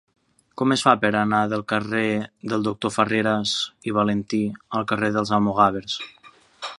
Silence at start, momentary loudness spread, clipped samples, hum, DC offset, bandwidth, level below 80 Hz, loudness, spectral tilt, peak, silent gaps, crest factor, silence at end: 0.55 s; 10 LU; under 0.1%; none; under 0.1%; 11.5 kHz; -58 dBFS; -22 LUFS; -5 dB/octave; -2 dBFS; none; 22 dB; 0.05 s